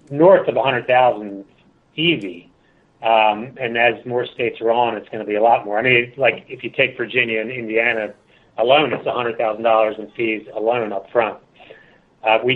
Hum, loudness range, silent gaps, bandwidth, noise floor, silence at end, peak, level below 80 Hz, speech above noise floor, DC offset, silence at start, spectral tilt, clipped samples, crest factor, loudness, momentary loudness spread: none; 2 LU; none; 4.2 kHz; -56 dBFS; 0 s; 0 dBFS; -62 dBFS; 38 dB; under 0.1%; 0.1 s; -7.5 dB/octave; under 0.1%; 18 dB; -18 LUFS; 10 LU